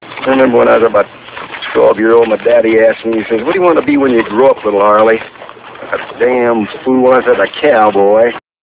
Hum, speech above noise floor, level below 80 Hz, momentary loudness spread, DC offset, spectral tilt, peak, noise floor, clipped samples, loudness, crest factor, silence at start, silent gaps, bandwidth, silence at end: none; 20 dB; -48 dBFS; 12 LU; under 0.1%; -9 dB/octave; 0 dBFS; -29 dBFS; 0.4%; -10 LUFS; 10 dB; 0 s; none; 4 kHz; 0.25 s